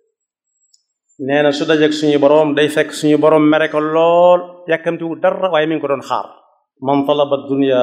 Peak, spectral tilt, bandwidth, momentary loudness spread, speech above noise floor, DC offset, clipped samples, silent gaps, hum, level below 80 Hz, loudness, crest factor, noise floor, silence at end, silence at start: 0 dBFS; -5.5 dB/octave; 13 kHz; 9 LU; 58 dB; under 0.1%; under 0.1%; none; none; -72 dBFS; -14 LUFS; 14 dB; -72 dBFS; 0 s; 1.2 s